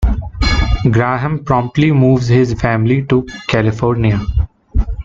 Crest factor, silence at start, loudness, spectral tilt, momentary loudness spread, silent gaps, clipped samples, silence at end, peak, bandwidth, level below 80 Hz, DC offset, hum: 12 dB; 0 s; -14 LUFS; -7.5 dB/octave; 8 LU; none; under 0.1%; 0 s; -2 dBFS; 7.6 kHz; -22 dBFS; under 0.1%; none